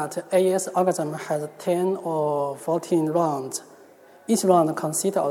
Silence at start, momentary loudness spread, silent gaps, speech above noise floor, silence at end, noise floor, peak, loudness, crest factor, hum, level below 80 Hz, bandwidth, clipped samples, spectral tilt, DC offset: 0 s; 9 LU; none; 27 dB; 0 s; -50 dBFS; -6 dBFS; -23 LUFS; 18 dB; none; -78 dBFS; 17 kHz; under 0.1%; -5.5 dB/octave; under 0.1%